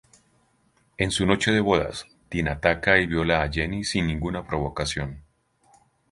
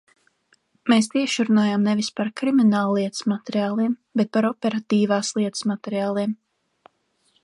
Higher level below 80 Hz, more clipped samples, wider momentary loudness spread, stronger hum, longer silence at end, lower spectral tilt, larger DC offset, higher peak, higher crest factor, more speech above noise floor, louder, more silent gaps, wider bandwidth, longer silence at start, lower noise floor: first, -40 dBFS vs -72 dBFS; neither; first, 11 LU vs 7 LU; neither; second, 0.9 s vs 1.1 s; about the same, -5 dB/octave vs -5 dB/octave; neither; first, -2 dBFS vs -6 dBFS; first, 24 dB vs 16 dB; second, 41 dB vs 45 dB; about the same, -24 LUFS vs -22 LUFS; neither; about the same, 11.5 kHz vs 11.5 kHz; first, 1 s vs 0.85 s; about the same, -65 dBFS vs -66 dBFS